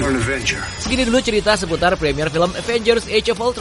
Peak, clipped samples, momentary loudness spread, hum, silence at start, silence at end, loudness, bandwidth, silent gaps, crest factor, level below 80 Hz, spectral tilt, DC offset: -2 dBFS; under 0.1%; 4 LU; none; 0 s; 0 s; -18 LUFS; 11.5 kHz; none; 16 dB; -34 dBFS; -4 dB/octave; under 0.1%